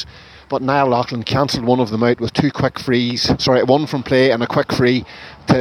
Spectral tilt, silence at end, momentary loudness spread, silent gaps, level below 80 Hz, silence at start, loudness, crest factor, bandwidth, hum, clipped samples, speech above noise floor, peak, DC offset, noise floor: -6 dB/octave; 0 s; 7 LU; none; -44 dBFS; 0 s; -17 LUFS; 16 dB; 15 kHz; none; under 0.1%; 21 dB; 0 dBFS; under 0.1%; -38 dBFS